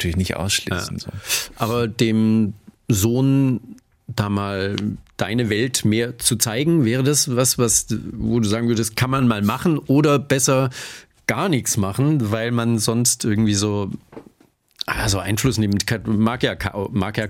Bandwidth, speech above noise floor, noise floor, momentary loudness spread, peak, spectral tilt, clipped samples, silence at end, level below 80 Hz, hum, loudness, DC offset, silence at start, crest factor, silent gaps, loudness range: 16.5 kHz; 38 dB; -58 dBFS; 9 LU; -2 dBFS; -4.5 dB/octave; under 0.1%; 0 s; -44 dBFS; none; -20 LUFS; under 0.1%; 0 s; 18 dB; none; 3 LU